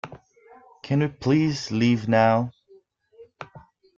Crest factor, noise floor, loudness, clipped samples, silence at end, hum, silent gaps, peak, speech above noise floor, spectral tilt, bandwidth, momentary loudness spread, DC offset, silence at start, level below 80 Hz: 18 dB; -57 dBFS; -22 LUFS; under 0.1%; 0.4 s; none; none; -6 dBFS; 35 dB; -7 dB/octave; 7.6 kHz; 23 LU; under 0.1%; 0.05 s; -60 dBFS